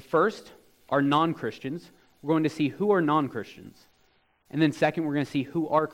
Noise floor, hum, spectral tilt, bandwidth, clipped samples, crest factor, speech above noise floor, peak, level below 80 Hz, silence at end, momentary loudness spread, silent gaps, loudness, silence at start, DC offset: -66 dBFS; none; -7 dB/octave; 15.5 kHz; under 0.1%; 18 dB; 40 dB; -8 dBFS; -68 dBFS; 0 s; 14 LU; none; -26 LUFS; 0.1 s; under 0.1%